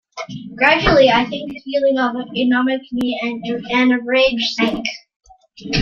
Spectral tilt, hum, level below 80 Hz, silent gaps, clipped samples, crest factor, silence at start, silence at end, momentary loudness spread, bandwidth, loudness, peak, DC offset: -5 dB/octave; none; -40 dBFS; 5.16-5.20 s; under 0.1%; 18 dB; 0.15 s; 0 s; 15 LU; 7.2 kHz; -17 LUFS; 0 dBFS; under 0.1%